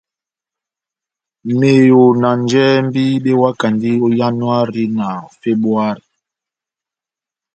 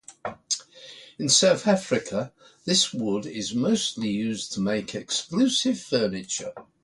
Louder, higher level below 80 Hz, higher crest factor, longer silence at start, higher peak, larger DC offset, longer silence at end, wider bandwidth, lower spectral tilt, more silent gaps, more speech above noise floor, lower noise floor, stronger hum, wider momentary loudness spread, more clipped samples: first, -14 LUFS vs -24 LUFS; first, -58 dBFS vs -64 dBFS; second, 14 dB vs 20 dB; first, 1.45 s vs 0.1 s; first, 0 dBFS vs -6 dBFS; neither; first, 1.6 s vs 0.2 s; second, 8.8 kHz vs 11.5 kHz; first, -7 dB/octave vs -3 dB/octave; neither; first, 75 dB vs 22 dB; first, -88 dBFS vs -47 dBFS; neither; second, 11 LU vs 17 LU; neither